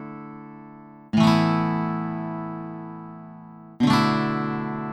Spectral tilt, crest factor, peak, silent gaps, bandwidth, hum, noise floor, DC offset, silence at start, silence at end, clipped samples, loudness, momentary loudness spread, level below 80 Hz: -6.5 dB/octave; 18 dB; -6 dBFS; none; 12.5 kHz; none; -44 dBFS; under 0.1%; 0 s; 0 s; under 0.1%; -23 LUFS; 23 LU; -58 dBFS